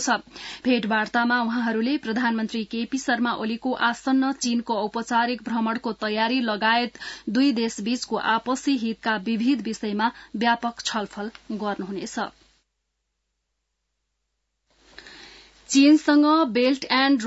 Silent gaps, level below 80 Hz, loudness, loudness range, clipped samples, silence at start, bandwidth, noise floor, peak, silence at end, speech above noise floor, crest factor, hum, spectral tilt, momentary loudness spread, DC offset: none; -62 dBFS; -23 LUFS; 10 LU; under 0.1%; 0 s; 8 kHz; -78 dBFS; -8 dBFS; 0 s; 55 dB; 16 dB; none; -3.5 dB/octave; 11 LU; under 0.1%